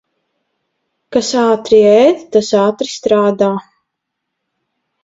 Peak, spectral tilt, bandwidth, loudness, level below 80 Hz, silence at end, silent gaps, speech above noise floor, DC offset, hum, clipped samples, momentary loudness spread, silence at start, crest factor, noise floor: 0 dBFS; -5 dB/octave; 7.8 kHz; -12 LUFS; -56 dBFS; 1.45 s; none; 64 dB; under 0.1%; none; under 0.1%; 9 LU; 1.1 s; 14 dB; -75 dBFS